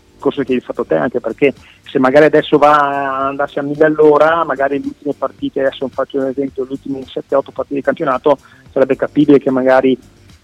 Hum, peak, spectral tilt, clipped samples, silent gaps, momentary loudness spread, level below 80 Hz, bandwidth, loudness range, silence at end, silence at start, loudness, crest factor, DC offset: none; 0 dBFS; -7 dB/octave; under 0.1%; none; 12 LU; -52 dBFS; 9.8 kHz; 7 LU; 0.5 s; 0.2 s; -14 LUFS; 14 dB; under 0.1%